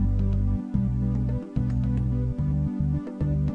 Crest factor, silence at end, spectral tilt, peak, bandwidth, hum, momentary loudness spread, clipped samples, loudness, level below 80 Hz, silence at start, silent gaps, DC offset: 14 dB; 0 s; -11 dB/octave; -12 dBFS; 4.3 kHz; none; 3 LU; under 0.1%; -27 LUFS; -30 dBFS; 0 s; none; under 0.1%